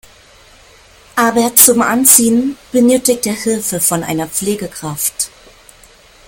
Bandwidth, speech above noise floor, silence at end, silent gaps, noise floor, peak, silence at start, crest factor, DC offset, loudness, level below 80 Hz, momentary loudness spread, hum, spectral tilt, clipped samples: 17 kHz; 31 dB; 1 s; none; -44 dBFS; 0 dBFS; 1.15 s; 14 dB; under 0.1%; -12 LUFS; -48 dBFS; 14 LU; none; -3 dB/octave; 0.3%